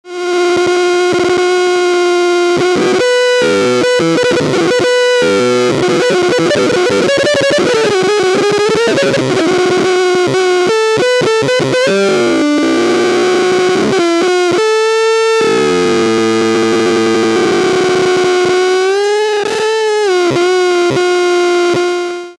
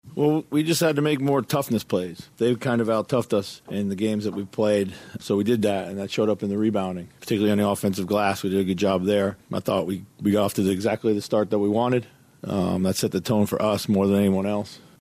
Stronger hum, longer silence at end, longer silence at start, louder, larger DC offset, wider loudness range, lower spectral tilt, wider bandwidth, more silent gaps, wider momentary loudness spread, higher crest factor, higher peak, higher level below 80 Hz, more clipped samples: neither; second, 0.05 s vs 0.2 s; about the same, 0.05 s vs 0.05 s; first, -11 LUFS vs -24 LUFS; neither; about the same, 1 LU vs 2 LU; second, -4 dB/octave vs -6 dB/octave; second, 12 kHz vs 15.5 kHz; neither; second, 1 LU vs 7 LU; about the same, 10 dB vs 14 dB; first, 0 dBFS vs -10 dBFS; first, -52 dBFS vs -62 dBFS; neither